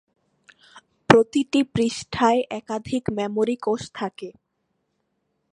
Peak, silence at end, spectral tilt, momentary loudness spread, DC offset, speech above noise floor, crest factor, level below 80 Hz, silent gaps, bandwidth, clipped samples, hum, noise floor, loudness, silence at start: 0 dBFS; 1.25 s; -5.5 dB/octave; 15 LU; under 0.1%; 52 dB; 24 dB; -56 dBFS; none; 11 kHz; under 0.1%; none; -74 dBFS; -22 LUFS; 0.75 s